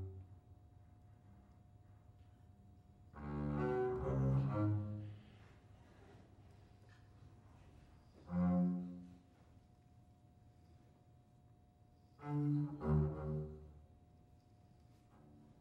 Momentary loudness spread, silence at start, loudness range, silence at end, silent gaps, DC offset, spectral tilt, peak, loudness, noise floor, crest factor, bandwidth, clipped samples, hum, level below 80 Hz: 28 LU; 0 s; 15 LU; 0.2 s; none; under 0.1%; -10.5 dB/octave; -26 dBFS; -40 LUFS; -67 dBFS; 18 dB; 5.2 kHz; under 0.1%; none; -58 dBFS